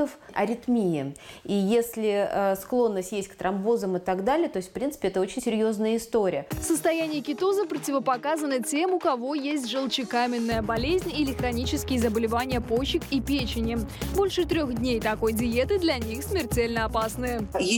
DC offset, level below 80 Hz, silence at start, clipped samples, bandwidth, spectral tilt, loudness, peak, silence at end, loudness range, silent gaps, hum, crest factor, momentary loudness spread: under 0.1%; -44 dBFS; 0 s; under 0.1%; 17.5 kHz; -5 dB/octave; -26 LUFS; -12 dBFS; 0 s; 1 LU; none; none; 14 dB; 5 LU